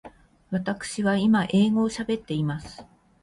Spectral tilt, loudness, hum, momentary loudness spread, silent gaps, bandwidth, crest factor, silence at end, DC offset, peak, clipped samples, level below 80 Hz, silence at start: -6 dB/octave; -25 LUFS; none; 10 LU; none; 11.5 kHz; 16 dB; 0.4 s; under 0.1%; -10 dBFS; under 0.1%; -56 dBFS; 0.05 s